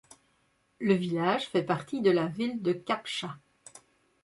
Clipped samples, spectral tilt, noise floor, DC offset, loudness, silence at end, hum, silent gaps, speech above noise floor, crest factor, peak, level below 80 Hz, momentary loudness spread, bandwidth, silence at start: under 0.1%; -6 dB/octave; -71 dBFS; under 0.1%; -29 LUFS; 0.45 s; none; none; 42 dB; 18 dB; -12 dBFS; -72 dBFS; 9 LU; 11.5 kHz; 0.8 s